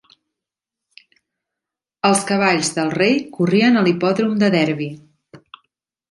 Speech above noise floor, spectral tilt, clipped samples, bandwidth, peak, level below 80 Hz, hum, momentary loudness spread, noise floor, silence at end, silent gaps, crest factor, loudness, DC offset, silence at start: 69 dB; -5 dB/octave; under 0.1%; 11.5 kHz; -2 dBFS; -64 dBFS; none; 6 LU; -85 dBFS; 0.75 s; none; 18 dB; -17 LUFS; under 0.1%; 2.05 s